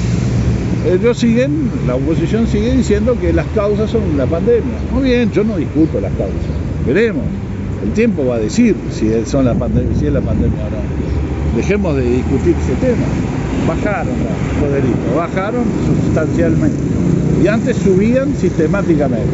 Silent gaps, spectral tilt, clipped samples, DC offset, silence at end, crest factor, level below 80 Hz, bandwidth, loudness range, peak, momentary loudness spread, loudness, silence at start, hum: none; -8 dB/octave; under 0.1%; under 0.1%; 0 s; 14 dB; -26 dBFS; 8 kHz; 2 LU; 0 dBFS; 5 LU; -15 LUFS; 0 s; none